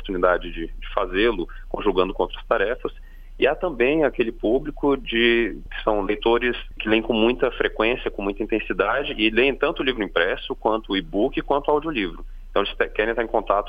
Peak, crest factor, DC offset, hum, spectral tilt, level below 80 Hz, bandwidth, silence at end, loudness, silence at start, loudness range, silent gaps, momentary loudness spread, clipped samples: -4 dBFS; 18 dB; under 0.1%; none; -7 dB/octave; -36 dBFS; 5 kHz; 0 s; -22 LUFS; 0 s; 2 LU; none; 8 LU; under 0.1%